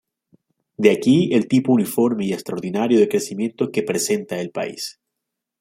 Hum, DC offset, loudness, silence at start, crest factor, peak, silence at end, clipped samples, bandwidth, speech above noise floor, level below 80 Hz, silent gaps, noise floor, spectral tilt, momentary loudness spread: none; under 0.1%; -20 LUFS; 0.8 s; 18 dB; -2 dBFS; 0.7 s; under 0.1%; 16.5 kHz; 62 dB; -64 dBFS; none; -81 dBFS; -5.5 dB/octave; 10 LU